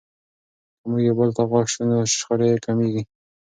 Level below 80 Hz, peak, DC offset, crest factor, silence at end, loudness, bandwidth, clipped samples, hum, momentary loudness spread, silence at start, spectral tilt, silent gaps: -60 dBFS; -4 dBFS; under 0.1%; 16 dB; 0.4 s; -21 LUFS; 9.6 kHz; under 0.1%; none; 9 LU; 0.85 s; -5.5 dB/octave; none